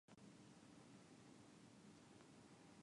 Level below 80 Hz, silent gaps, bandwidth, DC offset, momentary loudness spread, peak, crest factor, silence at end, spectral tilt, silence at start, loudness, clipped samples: -90 dBFS; none; 11 kHz; under 0.1%; 1 LU; -52 dBFS; 14 dB; 0 s; -4.5 dB/octave; 0.1 s; -66 LUFS; under 0.1%